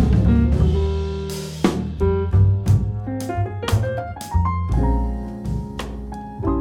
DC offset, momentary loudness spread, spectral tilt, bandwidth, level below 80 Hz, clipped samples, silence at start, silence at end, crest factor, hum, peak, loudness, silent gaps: under 0.1%; 11 LU; -7.5 dB/octave; 15.5 kHz; -26 dBFS; under 0.1%; 0 s; 0 s; 14 dB; none; -6 dBFS; -21 LUFS; none